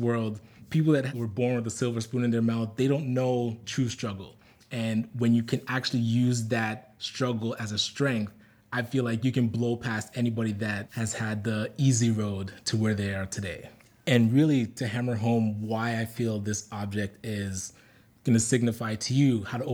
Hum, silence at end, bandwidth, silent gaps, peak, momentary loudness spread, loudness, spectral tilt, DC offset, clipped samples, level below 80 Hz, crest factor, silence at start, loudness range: none; 0 s; 18.5 kHz; none; -6 dBFS; 10 LU; -28 LUFS; -5.5 dB/octave; under 0.1%; under 0.1%; -66 dBFS; 22 dB; 0 s; 3 LU